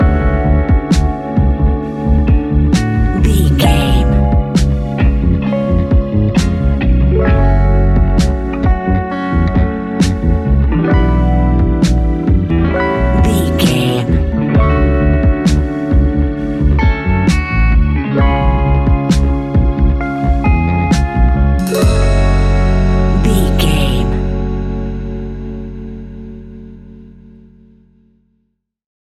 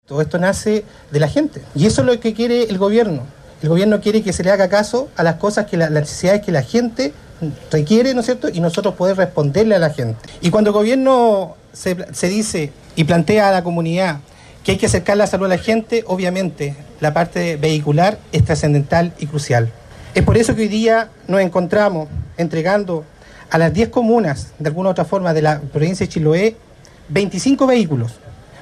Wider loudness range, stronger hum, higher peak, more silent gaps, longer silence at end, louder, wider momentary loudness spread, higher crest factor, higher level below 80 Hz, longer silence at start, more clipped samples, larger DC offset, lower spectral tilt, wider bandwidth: about the same, 4 LU vs 2 LU; neither; about the same, 0 dBFS vs -2 dBFS; neither; first, 2.05 s vs 0 s; first, -13 LUFS vs -16 LUFS; second, 5 LU vs 9 LU; about the same, 12 dB vs 14 dB; first, -14 dBFS vs -40 dBFS; about the same, 0 s vs 0.1 s; neither; neither; about the same, -7 dB/octave vs -6 dB/octave; about the same, 14 kHz vs 13.5 kHz